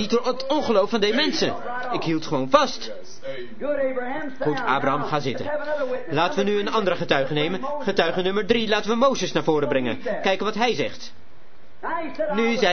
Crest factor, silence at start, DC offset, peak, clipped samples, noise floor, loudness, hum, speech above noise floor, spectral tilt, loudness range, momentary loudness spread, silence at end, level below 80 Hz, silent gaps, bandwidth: 22 dB; 0 s; 3%; -2 dBFS; under 0.1%; -53 dBFS; -23 LUFS; none; 30 dB; -4.5 dB/octave; 3 LU; 10 LU; 0 s; -56 dBFS; none; 6.6 kHz